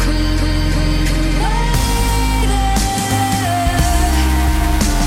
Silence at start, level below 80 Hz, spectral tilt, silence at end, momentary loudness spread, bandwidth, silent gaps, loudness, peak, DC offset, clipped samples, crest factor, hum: 0 s; -16 dBFS; -4.5 dB/octave; 0 s; 2 LU; 16.5 kHz; none; -16 LUFS; -2 dBFS; 0.3%; under 0.1%; 12 dB; none